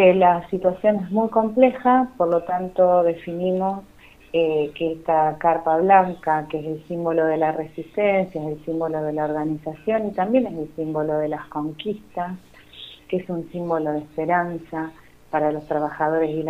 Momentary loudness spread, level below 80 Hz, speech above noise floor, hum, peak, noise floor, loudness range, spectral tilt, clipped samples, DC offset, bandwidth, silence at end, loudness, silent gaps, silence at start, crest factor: 12 LU; -56 dBFS; 22 dB; none; -2 dBFS; -43 dBFS; 7 LU; -8.5 dB/octave; under 0.1%; under 0.1%; 6.4 kHz; 0 s; -22 LUFS; none; 0 s; 20 dB